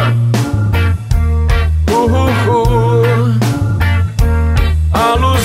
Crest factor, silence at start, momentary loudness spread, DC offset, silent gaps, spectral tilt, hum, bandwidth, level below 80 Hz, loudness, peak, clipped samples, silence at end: 10 dB; 0 s; 3 LU; under 0.1%; none; -6.5 dB/octave; none; 16 kHz; -18 dBFS; -13 LUFS; 0 dBFS; under 0.1%; 0 s